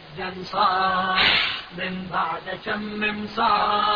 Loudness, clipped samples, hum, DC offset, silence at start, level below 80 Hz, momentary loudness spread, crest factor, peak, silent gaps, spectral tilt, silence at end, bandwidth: -22 LUFS; under 0.1%; none; under 0.1%; 0 s; -52 dBFS; 12 LU; 18 dB; -6 dBFS; none; -5 dB/octave; 0 s; 5.4 kHz